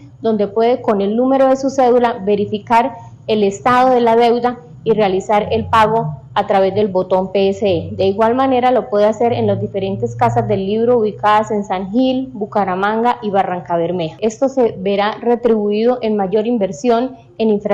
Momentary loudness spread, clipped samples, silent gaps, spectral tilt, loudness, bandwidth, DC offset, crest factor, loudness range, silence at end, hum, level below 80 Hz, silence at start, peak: 7 LU; under 0.1%; none; -6.5 dB/octave; -15 LUFS; 9.8 kHz; under 0.1%; 12 dB; 2 LU; 0 s; none; -50 dBFS; 0 s; -4 dBFS